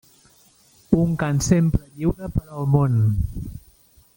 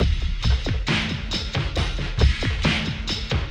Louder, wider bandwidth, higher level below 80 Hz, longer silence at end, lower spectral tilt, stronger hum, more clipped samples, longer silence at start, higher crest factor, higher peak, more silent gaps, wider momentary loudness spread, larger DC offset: first, -21 LUFS vs -24 LUFS; first, 17 kHz vs 10 kHz; second, -36 dBFS vs -26 dBFS; first, 0.55 s vs 0 s; first, -7 dB/octave vs -5 dB/octave; neither; neither; first, 0.9 s vs 0 s; about the same, 20 dB vs 18 dB; about the same, -2 dBFS vs -4 dBFS; neither; first, 10 LU vs 4 LU; neither